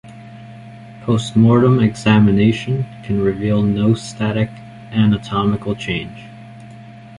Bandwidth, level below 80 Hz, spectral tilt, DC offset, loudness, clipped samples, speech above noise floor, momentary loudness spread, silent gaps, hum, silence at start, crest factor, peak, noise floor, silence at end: 11 kHz; -44 dBFS; -7.5 dB/octave; under 0.1%; -16 LUFS; under 0.1%; 22 dB; 25 LU; none; none; 0.05 s; 16 dB; -2 dBFS; -37 dBFS; 0.05 s